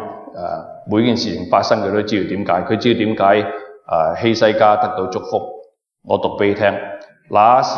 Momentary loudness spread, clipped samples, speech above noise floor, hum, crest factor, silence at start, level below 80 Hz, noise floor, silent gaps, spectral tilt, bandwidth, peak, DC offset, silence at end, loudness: 14 LU; under 0.1%; 27 dB; none; 16 dB; 0 s; -56 dBFS; -43 dBFS; none; -6 dB/octave; 7 kHz; 0 dBFS; under 0.1%; 0 s; -17 LUFS